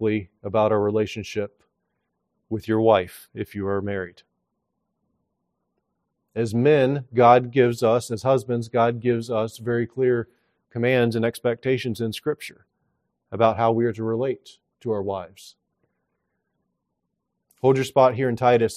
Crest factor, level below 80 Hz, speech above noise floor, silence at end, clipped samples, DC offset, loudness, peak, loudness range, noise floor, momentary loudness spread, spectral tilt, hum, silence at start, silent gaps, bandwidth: 22 dB; -64 dBFS; 57 dB; 0 s; under 0.1%; under 0.1%; -22 LUFS; -2 dBFS; 10 LU; -79 dBFS; 15 LU; -6.5 dB/octave; none; 0 s; none; 14.5 kHz